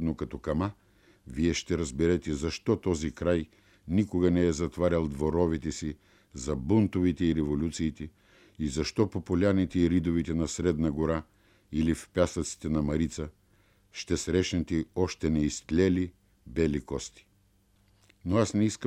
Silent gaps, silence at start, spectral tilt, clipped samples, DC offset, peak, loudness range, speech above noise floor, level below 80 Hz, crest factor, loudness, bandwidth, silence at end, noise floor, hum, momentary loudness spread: none; 0 s; -6 dB/octave; under 0.1%; under 0.1%; -10 dBFS; 2 LU; 38 dB; -46 dBFS; 20 dB; -29 LUFS; 12.5 kHz; 0 s; -66 dBFS; none; 11 LU